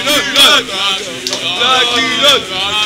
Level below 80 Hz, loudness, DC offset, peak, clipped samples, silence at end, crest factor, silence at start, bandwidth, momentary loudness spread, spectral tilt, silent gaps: -48 dBFS; -10 LUFS; under 0.1%; 0 dBFS; under 0.1%; 0 s; 12 dB; 0 s; 16.5 kHz; 10 LU; -0.5 dB/octave; none